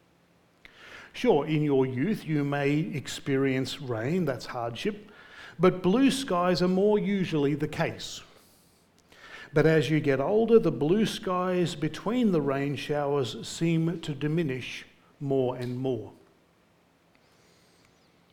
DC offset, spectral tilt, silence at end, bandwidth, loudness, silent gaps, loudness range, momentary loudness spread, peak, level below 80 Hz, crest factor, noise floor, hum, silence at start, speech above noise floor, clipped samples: under 0.1%; -6.5 dB/octave; 2.2 s; 18 kHz; -27 LUFS; none; 6 LU; 14 LU; -8 dBFS; -58 dBFS; 20 dB; -64 dBFS; none; 0.8 s; 38 dB; under 0.1%